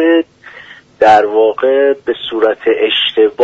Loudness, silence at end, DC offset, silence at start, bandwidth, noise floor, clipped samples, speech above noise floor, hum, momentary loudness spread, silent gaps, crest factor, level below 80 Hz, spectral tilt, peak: -11 LUFS; 0 s; under 0.1%; 0 s; 7.6 kHz; -37 dBFS; under 0.1%; 26 dB; none; 7 LU; none; 12 dB; -54 dBFS; -4.5 dB/octave; 0 dBFS